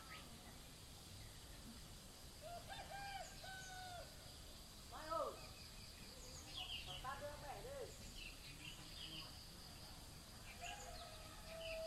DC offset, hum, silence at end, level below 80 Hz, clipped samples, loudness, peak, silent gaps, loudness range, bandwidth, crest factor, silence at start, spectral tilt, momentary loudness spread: under 0.1%; none; 0 s; -62 dBFS; under 0.1%; -53 LUFS; -32 dBFS; none; 4 LU; 16 kHz; 22 dB; 0 s; -3 dB/octave; 9 LU